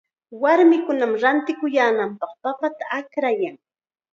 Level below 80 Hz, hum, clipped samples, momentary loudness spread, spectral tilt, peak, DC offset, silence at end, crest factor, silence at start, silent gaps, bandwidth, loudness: -80 dBFS; none; under 0.1%; 12 LU; -5.5 dB/octave; -4 dBFS; under 0.1%; 0.55 s; 16 dB; 0.3 s; none; 7.2 kHz; -20 LUFS